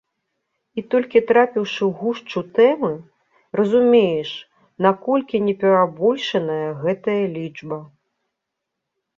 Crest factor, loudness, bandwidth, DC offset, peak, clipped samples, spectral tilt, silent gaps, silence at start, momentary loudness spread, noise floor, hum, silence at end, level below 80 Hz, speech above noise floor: 18 dB; -19 LUFS; 7 kHz; under 0.1%; -2 dBFS; under 0.1%; -7 dB/octave; none; 0.75 s; 15 LU; -80 dBFS; none; 1.3 s; -66 dBFS; 62 dB